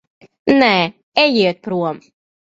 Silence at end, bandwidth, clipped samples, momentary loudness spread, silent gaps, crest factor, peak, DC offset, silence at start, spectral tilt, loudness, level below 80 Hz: 0.55 s; 7.8 kHz; under 0.1%; 12 LU; 1.03-1.12 s; 18 dB; 0 dBFS; under 0.1%; 0.45 s; -6 dB/octave; -16 LUFS; -56 dBFS